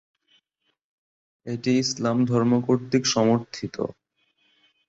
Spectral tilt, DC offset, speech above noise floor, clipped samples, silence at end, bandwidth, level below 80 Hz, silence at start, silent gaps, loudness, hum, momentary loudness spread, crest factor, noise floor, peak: -5 dB/octave; under 0.1%; 52 dB; under 0.1%; 0.95 s; 8 kHz; -64 dBFS; 1.45 s; none; -23 LUFS; none; 13 LU; 18 dB; -75 dBFS; -8 dBFS